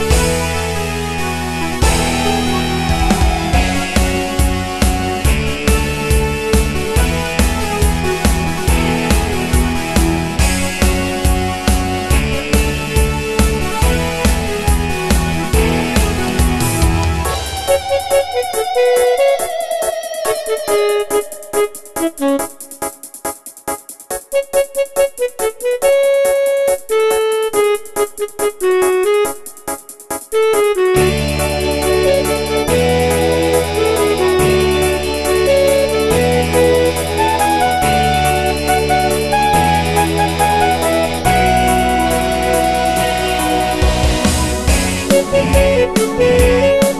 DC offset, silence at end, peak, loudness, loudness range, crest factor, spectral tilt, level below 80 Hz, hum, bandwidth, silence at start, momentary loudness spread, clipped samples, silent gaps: under 0.1%; 0 s; 0 dBFS; -15 LUFS; 3 LU; 14 dB; -4.5 dB/octave; -22 dBFS; none; 13.5 kHz; 0 s; 7 LU; under 0.1%; none